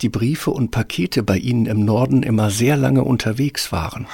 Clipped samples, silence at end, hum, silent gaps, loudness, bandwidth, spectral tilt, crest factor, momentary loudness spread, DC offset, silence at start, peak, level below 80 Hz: under 0.1%; 0 s; none; none; -18 LUFS; 17 kHz; -6 dB/octave; 14 dB; 5 LU; under 0.1%; 0 s; -4 dBFS; -40 dBFS